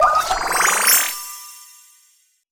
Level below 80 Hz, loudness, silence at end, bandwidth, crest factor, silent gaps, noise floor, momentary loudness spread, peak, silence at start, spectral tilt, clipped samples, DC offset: -46 dBFS; -15 LUFS; 0.9 s; over 20 kHz; 20 dB; none; -59 dBFS; 21 LU; 0 dBFS; 0 s; 1 dB/octave; under 0.1%; under 0.1%